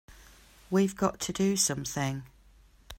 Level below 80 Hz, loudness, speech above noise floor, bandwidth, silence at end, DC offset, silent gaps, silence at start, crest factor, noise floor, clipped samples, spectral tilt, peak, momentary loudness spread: -56 dBFS; -29 LUFS; 30 dB; 16 kHz; 0.05 s; under 0.1%; none; 0.1 s; 20 dB; -58 dBFS; under 0.1%; -4 dB/octave; -12 dBFS; 8 LU